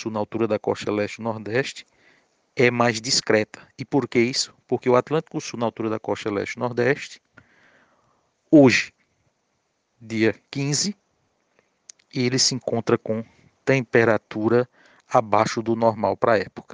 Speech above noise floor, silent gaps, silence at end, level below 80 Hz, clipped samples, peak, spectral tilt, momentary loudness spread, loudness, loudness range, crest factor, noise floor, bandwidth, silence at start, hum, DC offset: 50 dB; none; 0.1 s; -66 dBFS; under 0.1%; -4 dBFS; -4.5 dB/octave; 11 LU; -22 LUFS; 4 LU; 20 dB; -72 dBFS; 10 kHz; 0 s; none; under 0.1%